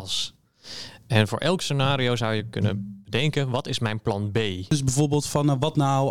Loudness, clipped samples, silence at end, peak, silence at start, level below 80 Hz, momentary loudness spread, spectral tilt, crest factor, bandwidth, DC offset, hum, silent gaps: -24 LUFS; under 0.1%; 0 s; -4 dBFS; 0 s; -54 dBFS; 8 LU; -5 dB/octave; 20 dB; 15 kHz; 0.6%; none; none